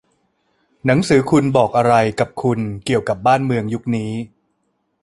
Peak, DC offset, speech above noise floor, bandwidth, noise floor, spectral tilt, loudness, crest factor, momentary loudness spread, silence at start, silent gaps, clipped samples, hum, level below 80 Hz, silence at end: -2 dBFS; under 0.1%; 52 dB; 11.5 kHz; -68 dBFS; -6.5 dB/octave; -17 LUFS; 16 dB; 9 LU; 0.85 s; none; under 0.1%; none; -50 dBFS; 0.75 s